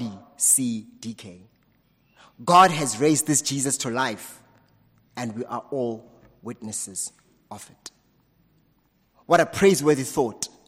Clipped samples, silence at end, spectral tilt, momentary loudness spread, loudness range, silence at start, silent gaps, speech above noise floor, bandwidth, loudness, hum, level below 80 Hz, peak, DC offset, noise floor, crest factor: under 0.1%; 0.2 s; -3.5 dB/octave; 23 LU; 12 LU; 0 s; none; 42 dB; 16 kHz; -22 LUFS; none; -62 dBFS; -4 dBFS; under 0.1%; -65 dBFS; 20 dB